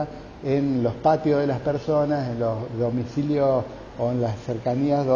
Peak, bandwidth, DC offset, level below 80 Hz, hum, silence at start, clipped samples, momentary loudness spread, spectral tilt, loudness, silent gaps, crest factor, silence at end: -8 dBFS; 7.2 kHz; under 0.1%; -50 dBFS; none; 0 s; under 0.1%; 6 LU; -8.5 dB/octave; -24 LUFS; none; 16 dB; 0 s